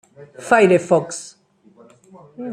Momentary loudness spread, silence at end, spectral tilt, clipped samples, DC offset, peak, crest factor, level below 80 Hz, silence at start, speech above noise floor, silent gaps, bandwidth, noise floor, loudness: 22 LU; 0 s; -5.5 dB/octave; under 0.1%; under 0.1%; -2 dBFS; 18 dB; -64 dBFS; 0.2 s; 35 dB; none; 11.5 kHz; -51 dBFS; -16 LUFS